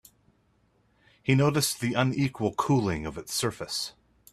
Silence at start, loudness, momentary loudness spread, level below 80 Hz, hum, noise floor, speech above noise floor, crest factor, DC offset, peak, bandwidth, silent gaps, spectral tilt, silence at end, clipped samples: 1.25 s; -27 LUFS; 9 LU; -56 dBFS; none; -67 dBFS; 41 dB; 20 dB; under 0.1%; -8 dBFS; 14.5 kHz; none; -5 dB/octave; 0.4 s; under 0.1%